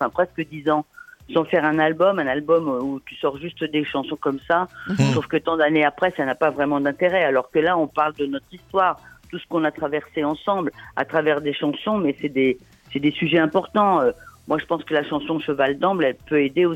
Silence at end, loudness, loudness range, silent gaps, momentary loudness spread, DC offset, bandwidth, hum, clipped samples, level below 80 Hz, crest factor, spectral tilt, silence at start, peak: 0 s; -22 LUFS; 3 LU; none; 8 LU; under 0.1%; 12.5 kHz; none; under 0.1%; -58 dBFS; 18 dB; -6.5 dB/octave; 0 s; -4 dBFS